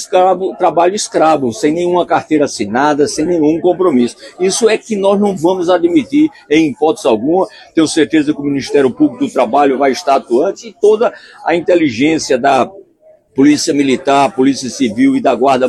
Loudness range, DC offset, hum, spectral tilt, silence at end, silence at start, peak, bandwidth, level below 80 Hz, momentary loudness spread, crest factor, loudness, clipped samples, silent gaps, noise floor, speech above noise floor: 1 LU; under 0.1%; none; -4.5 dB/octave; 0 s; 0 s; 0 dBFS; 12.5 kHz; -52 dBFS; 4 LU; 12 dB; -12 LUFS; under 0.1%; none; -47 dBFS; 35 dB